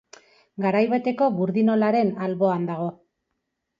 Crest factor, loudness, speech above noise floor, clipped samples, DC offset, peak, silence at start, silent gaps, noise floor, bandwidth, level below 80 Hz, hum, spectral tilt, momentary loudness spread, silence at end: 16 dB; -23 LUFS; 57 dB; under 0.1%; under 0.1%; -8 dBFS; 0.6 s; none; -79 dBFS; 7.2 kHz; -72 dBFS; none; -8.5 dB/octave; 9 LU; 0.85 s